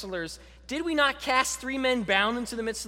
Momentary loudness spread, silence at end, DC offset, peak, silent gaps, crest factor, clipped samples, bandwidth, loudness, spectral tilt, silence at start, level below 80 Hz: 12 LU; 0 s; under 0.1%; -8 dBFS; none; 20 dB; under 0.1%; 16.5 kHz; -27 LUFS; -2.5 dB/octave; 0 s; -52 dBFS